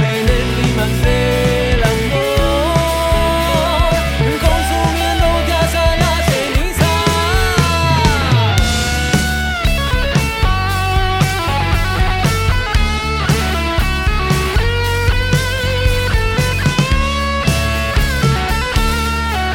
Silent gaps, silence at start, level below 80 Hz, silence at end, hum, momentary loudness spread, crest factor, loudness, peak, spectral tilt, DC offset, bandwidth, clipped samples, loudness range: none; 0 s; -20 dBFS; 0 s; none; 3 LU; 14 dB; -15 LUFS; 0 dBFS; -5 dB/octave; under 0.1%; 17 kHz; under 0.1%; 2 LU